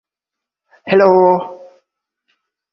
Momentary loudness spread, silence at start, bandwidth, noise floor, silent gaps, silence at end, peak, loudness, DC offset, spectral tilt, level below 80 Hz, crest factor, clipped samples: 21 LU; 0.85 s; 6 kHz; -84 dBFS; none; 1.2 s; 0 dBFS; -12 LUFS; under 0.1%; -8.5 dB/octave; -64 dBFS; 16 dB; under 0.1%